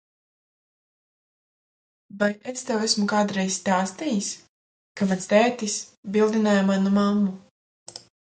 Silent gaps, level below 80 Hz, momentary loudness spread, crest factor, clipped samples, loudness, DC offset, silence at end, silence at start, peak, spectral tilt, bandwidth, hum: 4.49-4.95 s, 5.97-6.03 s, 7.51-7.86 s; -66 dBFS; 16 LU; 20 dB; under 0.1%; -23 LUFS; under 0.1%; 0.3 s; 2.15 s; -4 dBFS; -4.5 dB/octave; 9.4 kHz; none